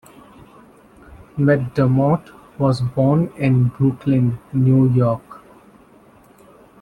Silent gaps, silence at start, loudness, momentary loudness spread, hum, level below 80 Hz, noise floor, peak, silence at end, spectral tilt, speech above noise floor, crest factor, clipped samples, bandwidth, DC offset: none; 1.35 s; -18 LUFS; 6 LU; none; -50 dBFS; -49 dBFS; -4 dBFS; 1.45 s; -9.5 dB/octave; 32 dB; 16 dB; under 0.1%; 9.2 kHz; under 0.1%